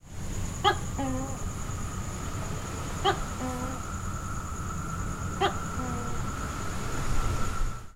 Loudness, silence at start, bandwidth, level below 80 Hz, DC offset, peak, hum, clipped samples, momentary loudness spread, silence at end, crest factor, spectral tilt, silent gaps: -32 LUFS; 0.05 s; 16 kHz; -36 dBFS; 0.2%; -10 dBFS; none; under 0.1%; 7 LU; 0.05 s; 20 dB; -4.5 dB/octave; none